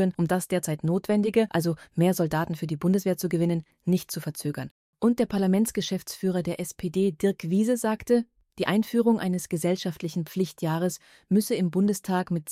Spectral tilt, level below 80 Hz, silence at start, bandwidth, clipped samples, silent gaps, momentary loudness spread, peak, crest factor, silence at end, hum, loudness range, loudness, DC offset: -6 dB/octave; -60 dBFS; 0 s; 16 kHz; under 0.1%; 4.71-4.93 s; 7 LU; -10 dBFS; 16 dB; 0 s; none; 2 LU; -26 LUFS; under 0.1%